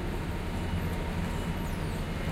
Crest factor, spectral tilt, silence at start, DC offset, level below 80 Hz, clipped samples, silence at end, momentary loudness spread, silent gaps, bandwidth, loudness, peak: 12 dB; -6 dB/octave; 0 s; under 0.1%; -36 dBFS; under 0.1%; 0 s; 2 LU; none; 16 kHz; -34 LUFS; -20 dBFS